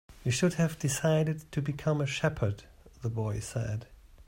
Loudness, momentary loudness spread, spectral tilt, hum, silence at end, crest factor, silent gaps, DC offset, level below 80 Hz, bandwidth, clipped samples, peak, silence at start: -31 LUFS; 9 LU; -5.5 dB/octave; none; 0.05 s; 18 dB; none; under 0.1%; -54 dBFS; 16 kHz; under 0.1%; -14 dBFS; 0.1 s